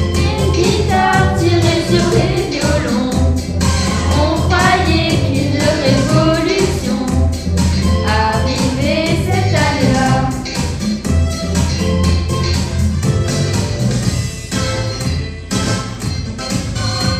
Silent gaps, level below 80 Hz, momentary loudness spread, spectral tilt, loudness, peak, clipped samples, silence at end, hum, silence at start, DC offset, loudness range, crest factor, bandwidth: none; -24 dBFS; 7 LU; -5.5 dB/octave; -15 LUFS; 0 dBFS; under 0.1%; 0 s; none; 0 s; under 0.1%; 4 LU; 14 dB; 14.5 kHz